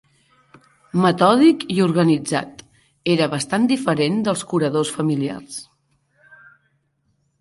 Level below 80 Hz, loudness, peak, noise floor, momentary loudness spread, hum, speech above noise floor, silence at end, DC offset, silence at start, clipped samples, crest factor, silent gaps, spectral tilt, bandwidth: -62 dBFS; -19 LUFS; -2 dBFS; -67 dBFS; 12 LU; none; 49 dB; 1.8 s; under 0.1%; 0.95 s; under 0.1%; 18 dB; none; -5.5 dB/octave; 11.5 kHz